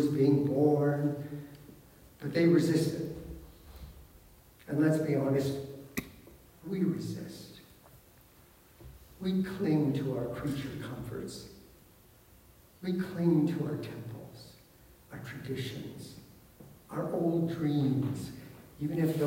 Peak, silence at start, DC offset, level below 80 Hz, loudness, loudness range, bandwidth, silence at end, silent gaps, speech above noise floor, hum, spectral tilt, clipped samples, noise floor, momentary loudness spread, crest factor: -14 dBFS; 0 s; under 0.1%; -60 dBFS; -32 LUFS; 8 LU; 16 kHz; 0 s; none; 29 dB; none; -7.5 dB/octave; under 0.1%; -59 dBFS; 24 LU; 18 dB